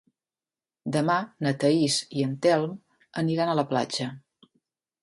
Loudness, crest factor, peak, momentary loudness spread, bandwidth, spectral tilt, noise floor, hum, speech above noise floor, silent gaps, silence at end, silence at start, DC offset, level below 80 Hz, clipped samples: -26 LUFS; 18 dB; -8 dBFS; 12 LU; 11.5 kHz; -5 dB/octave; under -90 dBFS; none; over 65 dB; none; 0.85 s; 0.85 s; under 0.1%; -70 dBFS; under 0.1%